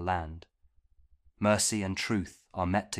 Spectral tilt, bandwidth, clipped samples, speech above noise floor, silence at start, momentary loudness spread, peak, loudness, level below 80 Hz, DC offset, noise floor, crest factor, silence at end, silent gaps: -4 dB/octave; 15.5 kHz; under 0.1%; 36 dB; 0 s; 15 LU; -12 dBFS; -30 LUFS; -54 dBFS; under 0.1%; -66 dBFS; 20 dB; 0 s; none